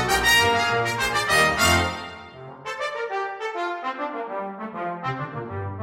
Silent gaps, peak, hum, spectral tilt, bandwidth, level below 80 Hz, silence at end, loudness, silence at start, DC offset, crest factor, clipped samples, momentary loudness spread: none; -6 dBFS; none; -3 dB/octave; 16.5 kHz; -46 dBFS; 0 s; -23 LUFS; 0 s; under 0.1%; 18 dB; under 0.1%; 16 LU